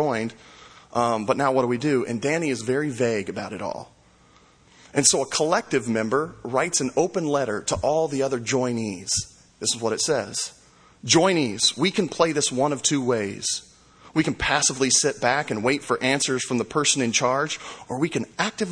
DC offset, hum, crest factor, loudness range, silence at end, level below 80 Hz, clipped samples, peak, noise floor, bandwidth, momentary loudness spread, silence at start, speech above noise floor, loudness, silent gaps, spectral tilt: under 0.1%; none; 22 dB; 3 LU; 0 s; -54 dBFS; under 0.1%; -2 dBFS; -55 dBFS; 10.5 kHz; 10 LU; 0 s; 32 dB; -23 LUFS; none; -3 dB/octave